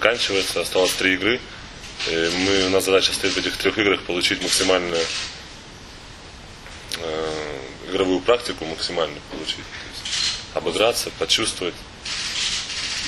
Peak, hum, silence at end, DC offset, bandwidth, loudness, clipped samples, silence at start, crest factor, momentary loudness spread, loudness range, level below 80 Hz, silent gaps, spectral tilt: 0 dBFS; none; 0 s; under 0.1%; 13 kHz; -21 LUFS; under 0.1%; 0 s; 22 dB; 18 LU; 7 LU; -46 dBFS; none; -2 dB/octave